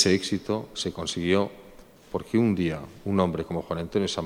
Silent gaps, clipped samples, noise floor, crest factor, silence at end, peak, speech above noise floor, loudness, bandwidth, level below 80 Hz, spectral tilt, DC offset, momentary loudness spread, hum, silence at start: none; under 0.1%; -50 dBFS; 22 dB; 0 s; -6 dBFS; 23 dB; -27 LUFS; 16 kHz; -52 dBFS; -5 dB/octave; under 0.1%; 9 LU; none; 0 s